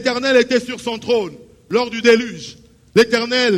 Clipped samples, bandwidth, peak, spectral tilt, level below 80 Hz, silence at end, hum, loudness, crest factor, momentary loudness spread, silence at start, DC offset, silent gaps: under 0.1%; 13 kHz; -2 dBFS; -4 dB/octave; -54 dBFS; 0 s; none; -17 LUFS; 16 dB; 14 LU; 0 s; under 0.1%; none